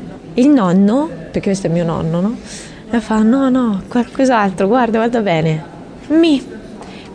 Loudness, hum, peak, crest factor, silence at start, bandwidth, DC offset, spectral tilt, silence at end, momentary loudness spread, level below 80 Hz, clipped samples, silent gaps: -15 LUFS; none; -2 dBFS; 12 dB; 0 s; 10 kHz; under 0.1%; -7 dB/octave; 0 s; 18 LU; -44 dBFS; under 0.1%; none